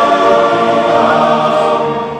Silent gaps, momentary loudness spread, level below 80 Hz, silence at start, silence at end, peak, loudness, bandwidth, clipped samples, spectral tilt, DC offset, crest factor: none; 3 LU; -50 dBFS; 0 s; 0 s; -2 dBFS; -11 LUFS; 10.5 kHz; under 0.1%; -5.5 dB/octave; under 0.1%; 10 dB